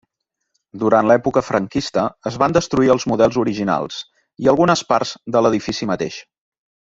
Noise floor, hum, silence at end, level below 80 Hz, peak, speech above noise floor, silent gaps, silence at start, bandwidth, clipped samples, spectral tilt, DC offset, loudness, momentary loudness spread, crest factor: -77 dBFS; none; 0.65 s; -50 dBFS; -2 dBFS; 60 dB; none; 0.75 s; 7.8 kHz; under 0.1%; -5.5 dB/octave; under 0.1%; -18 LUFS; 9 LU; 16 dB